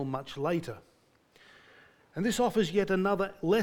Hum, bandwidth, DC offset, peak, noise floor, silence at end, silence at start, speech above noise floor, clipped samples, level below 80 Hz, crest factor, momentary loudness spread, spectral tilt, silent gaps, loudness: none; 18.5 kHz; under 0.1%; -14 dBFS; -65 dBFS; 0 s; 0 s; 35 dB; under 0.1%; -60 dBFS; 16 dB; 15 LU; -5.5 dB/octave; none; -30 LUFS